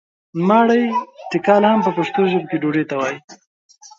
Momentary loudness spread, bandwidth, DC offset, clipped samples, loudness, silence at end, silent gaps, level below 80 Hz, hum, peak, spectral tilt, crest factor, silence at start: 11 LU; 7.4 kHz; under 0.1%; under 0.1%; -17 LUFS; 0.65 s; 3.24-3.28 s; -66 dBFS; none; -2 dBFS; -6.5 dB/octave; 16 dB; 0.35 s